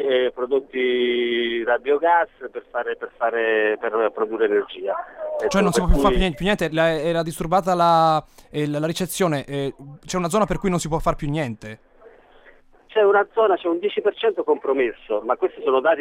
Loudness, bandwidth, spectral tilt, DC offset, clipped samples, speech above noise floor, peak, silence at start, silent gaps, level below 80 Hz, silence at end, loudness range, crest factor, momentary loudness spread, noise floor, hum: -21 LUFS; 16.5 kHz; -5 dB/octave; under 0.1%; under 0.1%; 30 dB; -4 dBFS; 0 s; none; -34 dBFS; 0 s; 4 LU; 18 dB; 10 LU; -51 dBFS; none